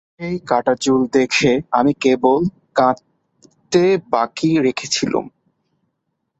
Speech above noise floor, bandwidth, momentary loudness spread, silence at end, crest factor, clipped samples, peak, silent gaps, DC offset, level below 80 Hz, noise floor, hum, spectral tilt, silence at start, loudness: 57 dB; 8.2 kHz; 7 LU; 1.1 s; 18 dB; under 0.1%; -2 dBFS; none; under 0.1%; -54 dBFS; -73 dBFS; none; -5 dB/octave; 0.2 s; -17 LUFS